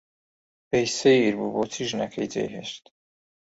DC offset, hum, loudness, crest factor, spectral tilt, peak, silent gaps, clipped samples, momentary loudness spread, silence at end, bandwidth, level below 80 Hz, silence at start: under 0.1%; none; -24 LUFS; 20 dB; -4 dB/octave; -8 dBFS; none; under 0.1%; 15 LU; 0.8 s; 8 kHz; -64 dBFS; 0.7 s